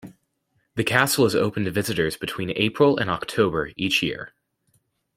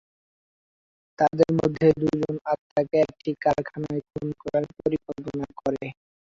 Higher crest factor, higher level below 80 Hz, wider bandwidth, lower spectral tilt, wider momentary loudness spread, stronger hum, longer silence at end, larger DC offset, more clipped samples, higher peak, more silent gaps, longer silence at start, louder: about the same, 22 dB vs 20 dB; about the same, -54 dBFS vs -56 dBFS; first, 16.5 kHz vs 7.6 kHz; second, -4.5 dB/octave vs -8 dB/octave; about the same, 9 LU vs 11 LU; neither; first, 0.9 s vs 0.45 s; neither; neither; first, -2 dBFS vs -6 dBFS; second, none vs 2.41-2.45 s, 2.59-2.76 s; second, 0.05 s vs 1.2 s; first, -22 LUFS vs -25 LUFS